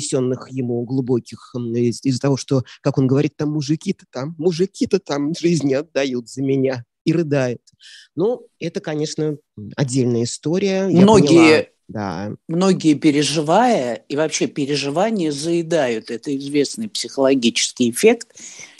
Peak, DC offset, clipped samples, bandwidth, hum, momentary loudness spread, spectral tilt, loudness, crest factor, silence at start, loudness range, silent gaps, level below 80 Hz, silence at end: 0 dBFS; under 0.1%; under 0.1%; 12.5 kHz; none; 11 LU; -5.5 dB/octave; -19 LUFS; 18 dB; 0 s; 7 LU; 7.01-7.05 s; -58 dBFS; 0.15 s